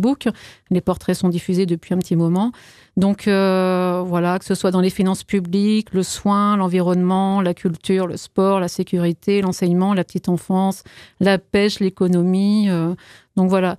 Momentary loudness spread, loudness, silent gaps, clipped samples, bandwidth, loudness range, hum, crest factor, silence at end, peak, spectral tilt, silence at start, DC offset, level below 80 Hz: 6 LU; -19 LUFS; none; under 0.1%; 13.5 kHz; 1 LU; none; 14 dB; 0 s; -4 dBFS; -6.5 dB/octave; 0 s; under 0.1%; -54 dBFS